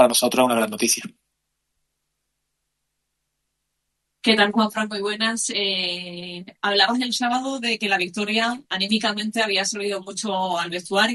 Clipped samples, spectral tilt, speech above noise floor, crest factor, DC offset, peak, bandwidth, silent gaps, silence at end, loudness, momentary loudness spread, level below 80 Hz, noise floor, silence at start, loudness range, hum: under 0.1%; -2 dB/octave; 55 dB; 22 dB; under 0.1%; -2 dBFS; 12.5 kHz; none; 0 s; -21 LUFS; 9 LU; -70 dBFS; -78 dBFS; 0 s; 5 LU; none